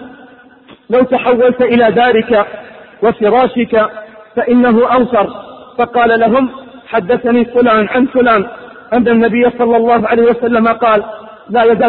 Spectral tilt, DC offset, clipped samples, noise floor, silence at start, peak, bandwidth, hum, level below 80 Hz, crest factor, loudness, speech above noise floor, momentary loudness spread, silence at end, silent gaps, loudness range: -10.5 dB/octave; under 0.1%; under 0.1%; -41 dBFS; 0 s; 0 dBFS; 4.2 kHz; none; -46 dBFS; 12 dB; -11 LUFS; 30 dB; 10 LU; 0 s; none; 2 LU